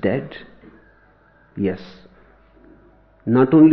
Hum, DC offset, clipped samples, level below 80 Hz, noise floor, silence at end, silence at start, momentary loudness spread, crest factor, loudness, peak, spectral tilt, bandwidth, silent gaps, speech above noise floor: none; under 0.1%; under 0.1%; -56 dBFS; -54 dBFS; 0 s; 0.05 s; 25 LU; 18 dB; -19 LUFS; -2 dBFS; -11 dB/octave; 5.2 kHz; none; 38 dB